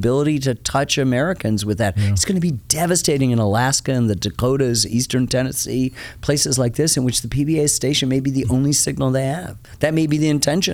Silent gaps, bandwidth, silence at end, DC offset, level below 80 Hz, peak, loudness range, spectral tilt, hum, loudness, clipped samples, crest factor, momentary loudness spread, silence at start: none; 18.5 kHz; 0 s; under 0.1%; -42 dBFS; 0 dBFS; 1 LU; -4.5 dB/octave; none; -18 LUFS; under 0.1%; 18 dB; 4 LU; 0 s